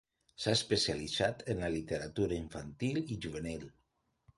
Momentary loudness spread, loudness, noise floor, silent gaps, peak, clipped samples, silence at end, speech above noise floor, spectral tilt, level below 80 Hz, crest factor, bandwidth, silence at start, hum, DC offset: 11 LU; -35 LUFS; -78 dBFS; none; -16 dBFS; under 0.1%; 0.65 s; 43 dB; -4.5 dB/octave; -56 dBFS; 20 dB; 11.5 kHz; 0.4 s; none; under 0.1%